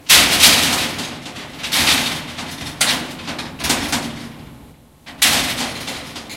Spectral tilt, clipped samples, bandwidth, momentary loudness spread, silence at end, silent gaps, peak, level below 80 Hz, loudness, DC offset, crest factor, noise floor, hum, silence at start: -0.5 dB/octave; under 0.1%; 17 kHz; 19 LU; 0 s; none; 0 dBFS; -44 dBFS; -15 LUFS; under 0.1%; 18 dB; -44 dBFS; none; 0.05 s